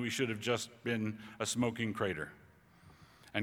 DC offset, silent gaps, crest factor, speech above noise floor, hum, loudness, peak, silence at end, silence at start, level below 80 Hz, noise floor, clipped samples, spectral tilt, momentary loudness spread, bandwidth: under 0.1%; none; 20 dB; 25 dB; none; -37 LUFS; -18 dBFS; 0 s; 0 s; -70 dBFS; -61 dBFS; under 0.1%; -4 dB/octave; 7 LU; 19 kHz